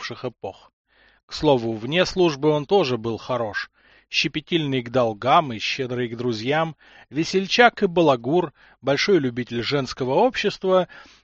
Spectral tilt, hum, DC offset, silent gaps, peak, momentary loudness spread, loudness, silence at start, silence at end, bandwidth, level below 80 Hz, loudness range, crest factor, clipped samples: -3.5 dB/octave; none; under 0.1%; 0.73-0.85 s, 1.23-1.28 s; 0 dBFS; 12 LU; -22 LUFS; 0 s; 0.2 s; 7.8 kHz; -54 dBFS; 3 LU; 22 dB; under 0.1%